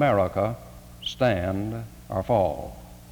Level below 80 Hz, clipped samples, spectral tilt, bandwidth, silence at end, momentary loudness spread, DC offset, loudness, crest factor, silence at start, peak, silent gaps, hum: -48 dBFS; under 0.1%; -6.5 dB/octave; over 20 kHz; 0 s; 16 LU; under 0.1%; -26 LUFS; 18 dB; 0 s; -8 dBFS; none; none